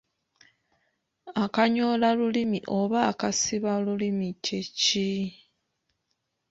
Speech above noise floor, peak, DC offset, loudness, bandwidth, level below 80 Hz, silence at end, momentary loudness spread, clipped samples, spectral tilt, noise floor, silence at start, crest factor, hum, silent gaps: 53 dB; -8 dBFS; under 0.1%; -26 LUFS; 8 kHz; -66 dBFS; 1.15 s; 7 LU; under 0.1%; -4 dB/octave; -78 dBFS; 1.25 s; 20 dB; none; none